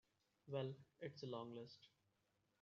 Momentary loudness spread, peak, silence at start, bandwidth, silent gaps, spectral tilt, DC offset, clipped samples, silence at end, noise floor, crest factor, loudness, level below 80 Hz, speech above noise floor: 11 LU; -32 dBFS; 0.45 s; 7.2 kHz; none; -5.5 dB/octave; under 0.1%; under 0.1%; 0.75 s; -85 dBFS; 22 dB; -52 LUFS; under -90 dBFS; 34 dB